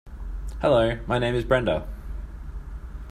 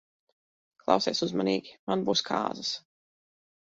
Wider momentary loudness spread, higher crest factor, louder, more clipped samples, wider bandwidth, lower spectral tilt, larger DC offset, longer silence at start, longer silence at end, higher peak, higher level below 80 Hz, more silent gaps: first, 18 LU vs 8 LU; about the same, 20 dB vs 24 dB; first, -24 LUFS vs -29 LUFS; neither; first, 13 kHz vs 7.8 kHz; first, -7 dB/octave vs -4 dB/octave; neither; second, 0.05 s vs 0.85 s; second, 0 s vs 0.9 s; about the same, -6 dBFS vs -6 dBFS; first, -34 dBFS vs -70 dBFS; second, none vs 1.79-1.87 s